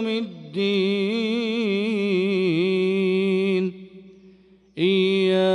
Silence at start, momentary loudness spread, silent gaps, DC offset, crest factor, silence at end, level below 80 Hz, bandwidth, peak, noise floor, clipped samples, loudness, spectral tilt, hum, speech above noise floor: 0 s; 8 LU; none; under 0.1%; 12 dB; 0 s; -68 dBFS; 10.5 kHz; -10 dBFS; -53 dBFS; under 0.1%; -22 LUFS; -7 dB/octave; none; 29 dB